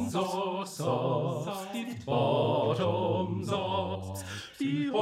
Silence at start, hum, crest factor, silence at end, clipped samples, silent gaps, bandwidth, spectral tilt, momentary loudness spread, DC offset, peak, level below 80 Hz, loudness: 0 s; none; 16 dB; 0 s; under 0.1%; none; 16 kHz; -6 dB/octave; 10 LU; under 0.1%; -14 dBFS; -68 dBFS; -31 LUFS